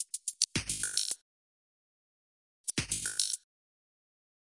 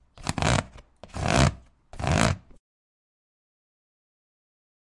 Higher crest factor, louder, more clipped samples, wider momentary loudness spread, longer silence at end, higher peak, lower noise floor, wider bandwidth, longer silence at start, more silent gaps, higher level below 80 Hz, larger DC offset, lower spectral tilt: about the same, 28 dB vs 28 dB; second, -33 LUFS vs -26 LUFS; neither; second, 8 LU vs 13 LU; second, 1.05 s vs 2.6 s; second, -10 dBFS vs -2 dBFS; first, under -90 dBFS vs -48 dBFS; about the same, 11.5 kHz vs 11.5 kHz; second, 0 s vs 0.15 s; first, 1.22-2.64 s vs none; second, -60 dBFS vs -40 dBFS; neither; second, -0.5 dB/octave vs -4.5 dB/octave